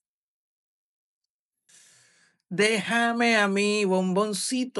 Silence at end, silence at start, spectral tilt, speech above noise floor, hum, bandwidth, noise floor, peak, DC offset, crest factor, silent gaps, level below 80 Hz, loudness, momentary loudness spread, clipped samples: 0 s; 2.5 s; -4 dB/octave; 57 dB; none; 13.5 kHz; -81 dBFS; -8 dBFS; under 0.1%; 18 dB; none; -90 dBFS; -23 LUFS; 5 LU; under 0.1%